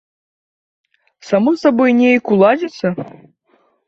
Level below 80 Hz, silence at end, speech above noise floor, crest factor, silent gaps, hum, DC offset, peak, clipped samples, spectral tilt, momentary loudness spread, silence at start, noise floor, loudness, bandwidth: -62 dBFS; 0.8 s; 45 dB; 14 dB; none; none; under 0.1%; -2 dBFS; under 0.1%; -7 dB/octave; 10 LU; 1.25 s; -59 dBFS; -14 LUFS; 7.2 kHz